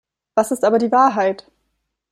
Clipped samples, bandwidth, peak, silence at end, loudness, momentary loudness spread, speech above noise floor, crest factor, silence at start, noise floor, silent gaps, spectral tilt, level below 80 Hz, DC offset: under 0.1%; 15.5 kHz; -2 dBFS; 0.75 s; -17 LUFS; 8 LU; 56 dB; 16 dB; 0.35 s; -73 dBFS; none; -5 dB/octave; -64 dBFS; under 0.1%